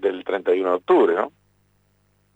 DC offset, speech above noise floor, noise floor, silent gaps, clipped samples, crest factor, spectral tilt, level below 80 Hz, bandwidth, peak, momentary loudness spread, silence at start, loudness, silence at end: under 0.1%; 45 dB; -64 dBFS; none; under 0.1%; 16 dB; -6.5 dB/octave; -70 dBFS; 7.6 kHz; -6 dBFS; 8 LU; 0 s; -20 LUFS; 1.1 s